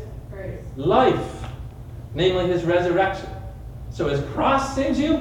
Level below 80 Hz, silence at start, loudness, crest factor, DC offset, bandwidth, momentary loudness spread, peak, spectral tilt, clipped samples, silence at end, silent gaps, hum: -38 dBFS; 0 s; -21 LUFS; 18 dB; under 0.1%; 13 kHz; 18 LU; -4 dBFS; -6.5 dB/octave; under 0.1%; 0 s; none; none